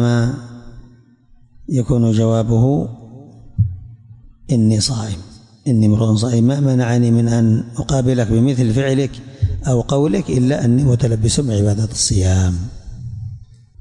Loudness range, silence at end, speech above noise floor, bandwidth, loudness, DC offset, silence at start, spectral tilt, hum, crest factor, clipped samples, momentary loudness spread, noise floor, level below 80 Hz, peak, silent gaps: 4 LU; 0.35 s; 33 dB; 11.5 kHz; -16 LUFS; under 0.1%; 0 s; -6.5 dB/octave; none; 12 dB; under 0.1%; 16 LU; -48 dBFS; -36 dBFS; -4 dBFS; none